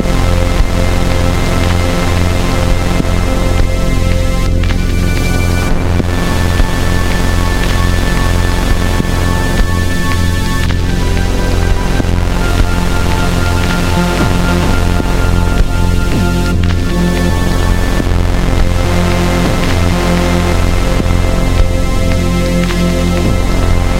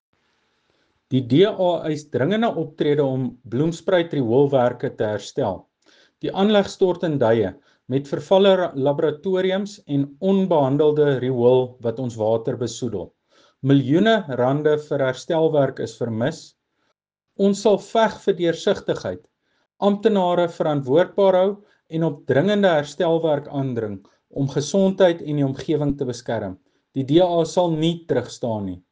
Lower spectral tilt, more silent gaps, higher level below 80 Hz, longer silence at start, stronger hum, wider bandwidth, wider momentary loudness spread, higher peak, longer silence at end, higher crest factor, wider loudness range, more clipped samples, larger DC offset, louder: about the same, -5.5 dB/octave vs -6.5 dB/octave; neither; first, -14 dBFS vs -58 dBFS; second, 0 s vs 1.1 s; neither; first, 16 kHz vs 9.6 kHz; second, 2 LU vs 10 LU; first, 0 dBFS vs -4 dBFS; second, 0 s vs 0.15 s; second, 10 dB vs 18 dB; about the same, 1 LU vs 3 LU; neither; first, 5% vs under 0.1%; first, -13 LUFS vs -21 LUFS